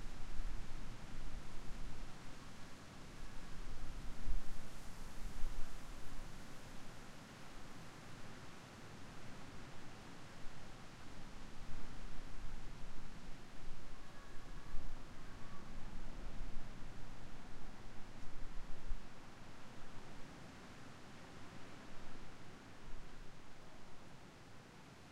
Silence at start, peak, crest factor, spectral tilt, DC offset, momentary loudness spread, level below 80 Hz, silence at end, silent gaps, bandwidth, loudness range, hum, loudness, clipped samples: 0 s; -22 dBFS; 18 dB; -4.5 dB/octave; under 0.1%; 5 LU; -48 dBFS; 0 s; none; 10 kHz; 4 LU; none; -55 LUFS; under 0.1%